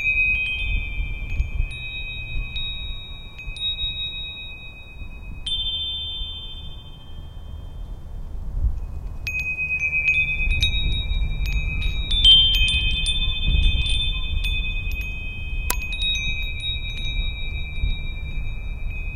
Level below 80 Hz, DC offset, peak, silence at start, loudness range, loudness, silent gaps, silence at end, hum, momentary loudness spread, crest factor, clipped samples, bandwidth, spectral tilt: -26 dBFS; under 0.1%; 0 dBFS; 0 s; 11 LU; -22 LUFS; none; 0 s; none; 20 LU; 24 dB; under 0.1%; 16 kHz; -2.5 dB/octave